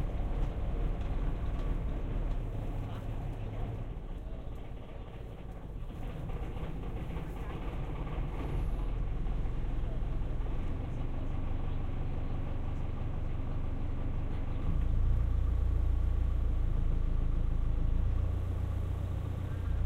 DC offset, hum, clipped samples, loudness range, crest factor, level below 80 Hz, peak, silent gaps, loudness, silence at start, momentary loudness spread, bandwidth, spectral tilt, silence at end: under 0.1%; none; under 0.1%; 9 LU; 14 dB; -34 dBFS; -18 dBFS; none; -37 LUFS; 0 s; 10 LU; 4.2 kHz; -8.5 dB/octave; 0 s